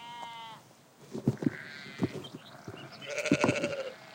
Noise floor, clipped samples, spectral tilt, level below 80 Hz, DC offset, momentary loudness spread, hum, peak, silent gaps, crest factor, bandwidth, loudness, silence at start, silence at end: -57 dBFS; under 0.1%; -5.5 dB/octave; -66 dBFS; under 0.1%; 19 LU; none; -12 dBFS; none; 24 dB; 17 kHz; -34 LUFS; 0 s; 0 s